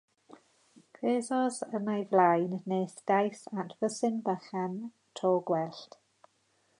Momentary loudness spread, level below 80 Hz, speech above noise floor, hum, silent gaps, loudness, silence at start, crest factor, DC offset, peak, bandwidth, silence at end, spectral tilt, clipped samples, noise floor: 13 LU; -86 dBFS; 42 dB; none; none; -31 LUFS; 1 s; 20 dB; under 0.1%; -12 dBFS; 11.5 kHz; 0.95 s; -6 dB/octave; under 0.1%; -72 dBFS